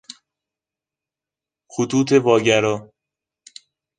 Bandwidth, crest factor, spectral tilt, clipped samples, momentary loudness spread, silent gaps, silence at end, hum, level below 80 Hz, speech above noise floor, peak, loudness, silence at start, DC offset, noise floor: 9.8 kHz; 20 dB; -5 dB/octave; under 0.1%; 13 LU; none; 1.15 s; none; -62 dBFS; 72 dB; -2 dBFS; -18 LUFS; 1.75 s; under 0.1%; -89 dBFS